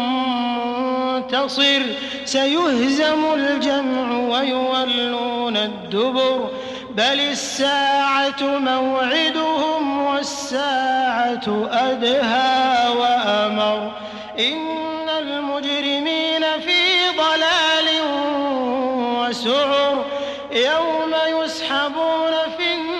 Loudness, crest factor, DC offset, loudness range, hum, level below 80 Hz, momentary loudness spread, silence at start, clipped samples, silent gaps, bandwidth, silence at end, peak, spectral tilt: -19 LUFS; 12 dB; under 0.1%; 3 LU; none; -60 dBFS; 7 LU; 0 s; under 0.1%; none; 12 kHz; 0 s; -6 dBFS; -2.5 dB/octave